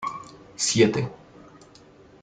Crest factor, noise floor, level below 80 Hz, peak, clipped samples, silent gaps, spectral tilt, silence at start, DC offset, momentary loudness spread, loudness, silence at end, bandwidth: 22 dB; -51 dBFS; -60 dBFS; -6 dBFS; under 0.1%; none; -4 dB/octave; 0 s; under 0.1%; 21 LU; -23 LUFS; 1.1 s; 9.6 kHz